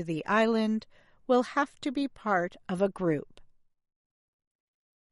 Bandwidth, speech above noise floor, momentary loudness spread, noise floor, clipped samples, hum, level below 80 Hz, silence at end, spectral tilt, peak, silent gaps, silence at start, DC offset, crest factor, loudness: 11.5 kHz; 27 dB; 9 LU; -56 dBFS; under 0.1%; none; -64 dBFS; 1.65 s; -6.5 dB/octave; -12 dBFS; none; 0 s; under 0.1%; 18 dB; -29 LUFS